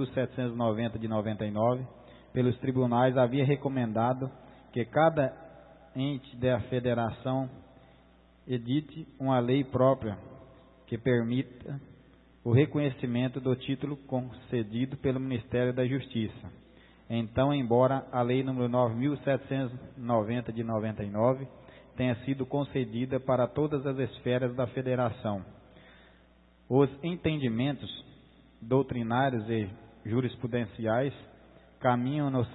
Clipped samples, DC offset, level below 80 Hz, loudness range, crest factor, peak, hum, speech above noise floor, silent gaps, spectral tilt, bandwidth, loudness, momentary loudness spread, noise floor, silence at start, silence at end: under 0.1%; under 0.1%; -60 dBFS; 4 LU; 20 dB; -10 dBFS; none; 31 dB; none; -11.5 dB/octave; 4.1 kHz; -30 LUFS; 12 LU; -60 dBFS; 0 s; 0 s